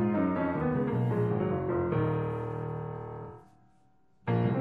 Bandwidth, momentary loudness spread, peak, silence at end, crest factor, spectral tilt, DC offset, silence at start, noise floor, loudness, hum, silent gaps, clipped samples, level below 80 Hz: 4.1 kHz; 12 LU; -16 dBFS; 0 s; 14 dB; -10.5 dB/octave; under 0.1%; 0 s; -68 dBFS; -31 LUFS; none; none; under 0.1%; -56 dBFS